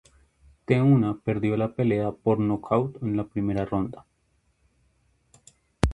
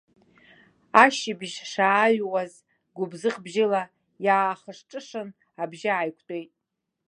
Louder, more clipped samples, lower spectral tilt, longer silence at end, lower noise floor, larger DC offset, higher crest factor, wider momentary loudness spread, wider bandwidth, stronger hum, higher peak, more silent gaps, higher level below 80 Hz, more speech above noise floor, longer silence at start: about the same, -25 LUFS vs -24 LUFS; neither; first, -8.5 dB/octave vs -4 dB/octave; second, 0 s vs 0.65 s; second, -69 dBFS vs -82 dBFS; neither; about the same, 26 dB vs 26 dB; second, 8 LU vs 18 LU; about the same, 11.5 kHz vs 11 kHz; neither; about the same, 0 dBFS vs 0 dBFS; neither; first, -42 dBFS vs -78 dBFS; second, 45 dB vs 57 dB; second, 0.7 s vs 0.95 s